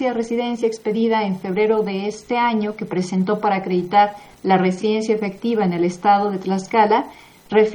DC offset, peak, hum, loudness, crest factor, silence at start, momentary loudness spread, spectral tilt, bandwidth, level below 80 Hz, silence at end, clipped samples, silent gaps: under 0.1%; -2 dBFS; none; -19 LUFS; 18 dB; 0 s; 7 LU; -6.5 dB/octave; 10.5 kHz; -60 dBFS; 0 s; under 0.1%; none